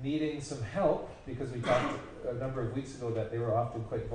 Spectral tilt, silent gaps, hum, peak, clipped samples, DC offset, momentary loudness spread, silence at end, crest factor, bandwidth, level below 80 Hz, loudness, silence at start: -6.5 dB/octave; none; none; -16 dBFS; under 0.1%; under 0.1%; 9 LU; 0 s; 18 dB; 10 kHz; -52 dBFS; -34 LUFS; 0 s